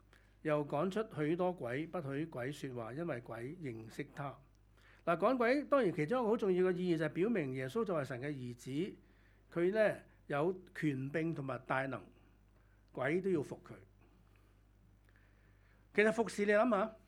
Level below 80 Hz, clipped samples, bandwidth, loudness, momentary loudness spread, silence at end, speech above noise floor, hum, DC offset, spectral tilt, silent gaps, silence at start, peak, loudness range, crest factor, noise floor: -68 dBFS; under 0.1%; 13.5 kHz; -37 LUFS; 13 LU; 0.1 s; 30 dB; none; under 0.1%; -7 dB/octave; none; 0.45 s; -14 dBFS; 9 LU; 22 dB; -66 dBFS